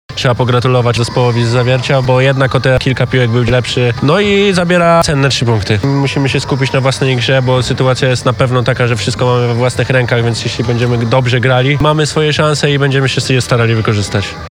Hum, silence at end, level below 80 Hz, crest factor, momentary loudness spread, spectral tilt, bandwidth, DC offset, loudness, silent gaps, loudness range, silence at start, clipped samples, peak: none; 0.05 s; -34 dBFS; 10 dB; 4 LU; -5.5 dB/octave; 11.5 kHz; under 0.1%; -11 LUFS; none; 2 LU; 0.1 s; under 0.1%; 0 dBFS